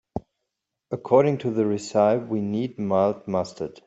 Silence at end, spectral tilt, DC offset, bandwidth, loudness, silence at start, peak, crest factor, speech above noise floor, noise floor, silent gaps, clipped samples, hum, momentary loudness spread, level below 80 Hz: 0.05 s; -7 dB/octave; under 0.1%; 8.2 kHz; -23 LUFS; 0.15 s; -4 dBFS; 20 dB; 59 dB; -82 dBFS; none; under 0.1%; none; 15 LU; -58 dBFS